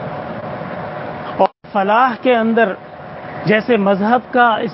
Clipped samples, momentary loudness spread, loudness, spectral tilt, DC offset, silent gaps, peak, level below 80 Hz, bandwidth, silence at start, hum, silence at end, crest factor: under 0.1%; 13 LU; -16 LUFS; -11 dB/octave; under 0.1%; none; 0 dBFS; -54 dBFS; 5.8 kHz; 0 s; none; 0 s; 16 dB